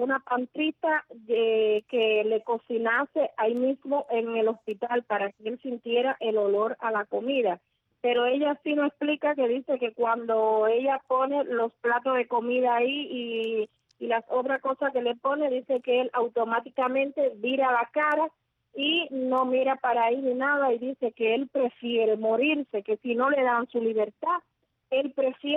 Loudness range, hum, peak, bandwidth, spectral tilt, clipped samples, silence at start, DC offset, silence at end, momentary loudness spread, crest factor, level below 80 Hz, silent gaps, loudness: 2 LU; none; -14 dBFS; 4 kHz; -6 dB/octave; under 0.1%; 0 s; under 0.1%; 0 s; 6 LU; 14 dB; -78 dBFS; none; -27 LUFS